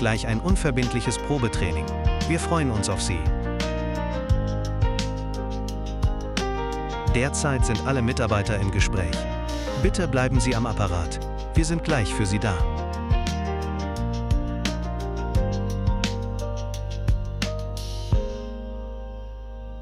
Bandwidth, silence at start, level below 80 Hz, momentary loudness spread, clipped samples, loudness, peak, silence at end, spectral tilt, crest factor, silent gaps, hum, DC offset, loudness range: 12.5 kHz; 0 s; -30 dBFS; 8 LU; under 0.1%; -26 LUFS; -6 dBFS; 0 s; -5.5 dB/octave; 18 dB; none; none; under 0.1%; 4 LU